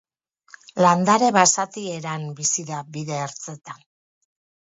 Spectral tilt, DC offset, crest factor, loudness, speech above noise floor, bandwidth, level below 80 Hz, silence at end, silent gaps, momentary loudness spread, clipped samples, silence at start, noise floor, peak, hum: -3.5 dB/octave; under 0.1%; 22 dB; -21 LUFS; 39 dB; 8 kHz; -70 dBFS; 0.95 s; none; 19 LU; under 0.1%; 0.75 s; -60 dBFS; -2 dBFS; none